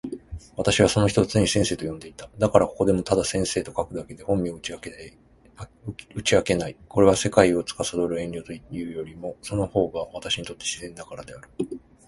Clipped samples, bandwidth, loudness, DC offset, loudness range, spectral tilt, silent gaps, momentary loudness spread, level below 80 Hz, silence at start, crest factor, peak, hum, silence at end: under 0.1%; 11.5 kHz; -24 LUFS; under 0.1%; 7 LU; -4.5 dB/octave; none; 19 LU; -46 dBFS; 0.05 s; 24 dB; 0 dBFS; none; 0.3 s